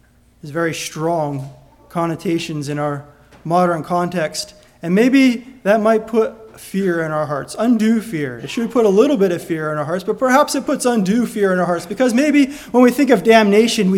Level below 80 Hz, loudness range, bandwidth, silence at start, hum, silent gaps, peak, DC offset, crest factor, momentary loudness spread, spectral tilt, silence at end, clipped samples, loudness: -54 dBFS; 6 LU; 17 kHz; 0.45 s; none; none; 0 dBFS; under 0.1%; 16 dB; 11 LU; -5.5 dB/octave; 0 s; under 0.1%; -17 LUFS